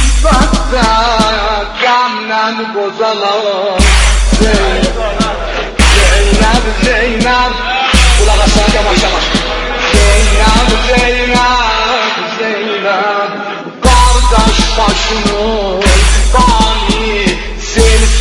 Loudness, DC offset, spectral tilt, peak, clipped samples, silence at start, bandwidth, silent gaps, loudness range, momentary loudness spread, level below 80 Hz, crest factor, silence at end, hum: -10 LUFS; under 0.1%; -4 dB/octave; 0 dBFS; 0.5%; 0 s; 11.5 kHz; none; 2 LU; 6 LU; -12 dBFS; 10 dB; 0 s; none